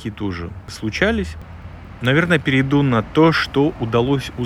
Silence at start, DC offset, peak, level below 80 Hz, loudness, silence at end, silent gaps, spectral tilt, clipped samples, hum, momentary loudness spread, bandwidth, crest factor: 0 s; under 0.1%; 0 dBFS; -38 dBFS; -18 LUFS; 0 s; none; -6.5 dB/octave; under 0.1%; none; 17 LU; 13 kHz; 18 dB